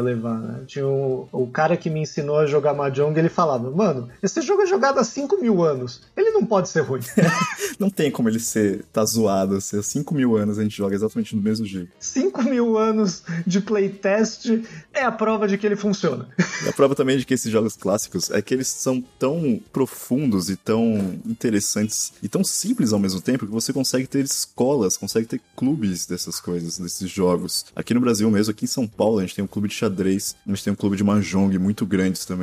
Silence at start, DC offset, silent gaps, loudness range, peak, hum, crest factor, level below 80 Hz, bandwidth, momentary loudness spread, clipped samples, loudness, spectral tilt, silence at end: 0 s; under 0.1%; none; 2 LU; -4 dBFS; none; 18 dB; -60 dBFS; 15.5 kHz; 7 LU; under 0.1%; -22 LUFS; -5 dB/octave; 0 s